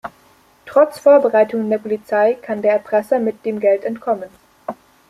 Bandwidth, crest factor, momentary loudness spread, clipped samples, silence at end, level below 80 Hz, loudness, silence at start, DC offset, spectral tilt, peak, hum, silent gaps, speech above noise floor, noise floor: 13.5 kHz; 16 dB; 20 LU; under 0.1%; 0.35 s; -64 dBFS; -17 LUFS; 0.05 s; under 0.1%; -6.5 dB/octave; -2 dBFS; none; none; 36 dB; -52 dBFS